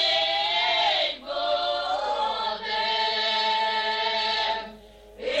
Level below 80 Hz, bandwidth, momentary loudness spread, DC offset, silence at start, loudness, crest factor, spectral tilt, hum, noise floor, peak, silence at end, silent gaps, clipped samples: -58 dBFS; 9.2 kHz; 7 LU; under 0.1%; 0 s; -24 LUFS; 14 dB; -1 dB/octave; none; -47 dBFS; -12 dBFS; 0 s; none; under 0.1%